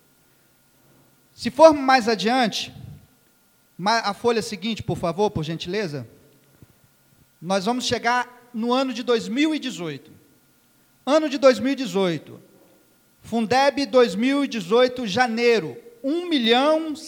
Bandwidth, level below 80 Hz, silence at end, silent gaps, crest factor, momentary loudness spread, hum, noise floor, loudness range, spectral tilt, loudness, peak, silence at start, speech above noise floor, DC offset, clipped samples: 19 kHz; -60 dBFS; 0 s; none; 22 dB; 13 LU; none; -60 dBFS; 6 LU; -4.5 dB/octave; -21 LUFS; 0 dBFS; 1.4 s; 39 dB; under 0.1%; under 0.1%